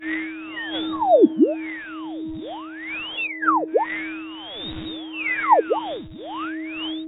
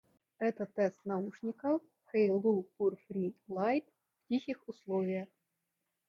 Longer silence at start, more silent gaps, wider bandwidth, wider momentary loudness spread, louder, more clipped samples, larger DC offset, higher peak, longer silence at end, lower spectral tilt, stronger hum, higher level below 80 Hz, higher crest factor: second, 0 s vs 0.4 s; neither; second, 4 kHz vs 7 kHz; first, 15 LU vs 8 LU; first, -23 LUFS vs -35 LUFS; neither; neither; first, -4 dBFS vs -18 dBFS; second, 0 s vs 0.85 s; about the same, -9 dB/octave vs -8.5 dB/octave; neither; first, -56 dBFS vs -82 dBFS; about the same, 20 dB vs 16 dB